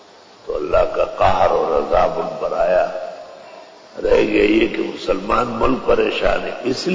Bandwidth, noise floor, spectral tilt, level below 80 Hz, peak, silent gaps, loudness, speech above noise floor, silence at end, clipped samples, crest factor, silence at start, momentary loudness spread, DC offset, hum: 7.8 kHz; -40 dBFS; -5.5 dB/octave; -36 dBFS; -4 dBFS; none; -18 LUFS; 23 dB; 0 s; under 0.1%; 14 dB; 0.45 s; 14 LU; under 0.1%; none